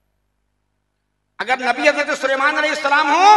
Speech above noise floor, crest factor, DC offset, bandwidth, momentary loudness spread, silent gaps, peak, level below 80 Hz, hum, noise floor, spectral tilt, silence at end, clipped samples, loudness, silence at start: 56 dB; 18 dB; under 0.1%; 12 kHz; 6 LU; none; 0 dBFS; -68 dBFS; 50 Hz at -65 dBFS; -71 dBFS; -1 dB/octave; 0 s; under 0.1%; -16 LUFS; 1.4 s